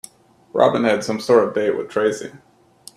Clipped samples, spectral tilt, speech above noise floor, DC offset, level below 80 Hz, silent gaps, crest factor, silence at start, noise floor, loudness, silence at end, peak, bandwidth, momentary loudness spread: under 0.1%; -5 dB/octave; 29 dB; under 0.1%; -62 dBFS; none; 20 dB; 0.55 s; -47 dBFS; -19 LUFS; 0.6 s; 0 dBFS; 13.5 kHz; 11 LU